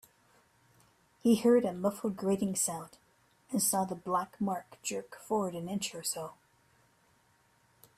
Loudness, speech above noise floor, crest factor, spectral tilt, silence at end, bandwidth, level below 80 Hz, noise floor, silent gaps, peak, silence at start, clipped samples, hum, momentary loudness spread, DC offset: -32 LUFS; 37 dB; 20 dB; -4.5 dB/octave; 1.65 s; 15.5 kHz; -72 dBFS; -69 dBFS; none; -16 dBFS; 1.25 s; under 0.1%; none; 11 LU; under 0.1%